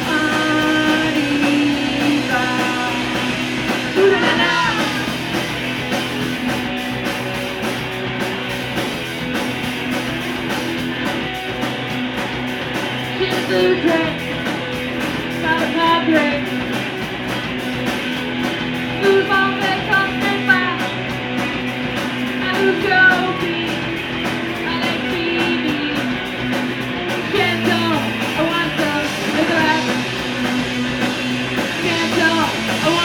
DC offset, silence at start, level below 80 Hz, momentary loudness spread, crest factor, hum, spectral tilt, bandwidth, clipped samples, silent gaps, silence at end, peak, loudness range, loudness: under 0.1%; 0 s; -46 dBFS; 7 LU; 18 dB; none; -4.5 dB/octave; 19 kHz; under 0.1%; none; 0 s; -2 dBFS; 5 LU; -18 LUFS